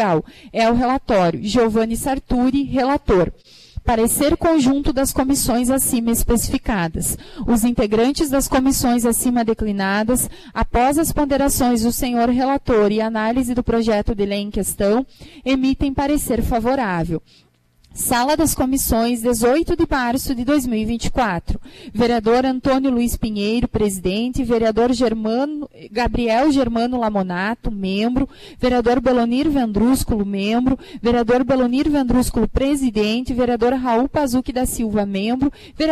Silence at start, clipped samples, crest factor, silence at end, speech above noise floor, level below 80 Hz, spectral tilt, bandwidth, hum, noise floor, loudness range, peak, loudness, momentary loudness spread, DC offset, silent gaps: 0 s; under 0.1%; 12 dB; 0 s; 35 dB; -32 dBFS; -4.5 dB/octave; 14 kHz; none; -53 dBFS; 2 LU; -6 dBFS; -18 LUFS; 6 LU; under 0.1%; none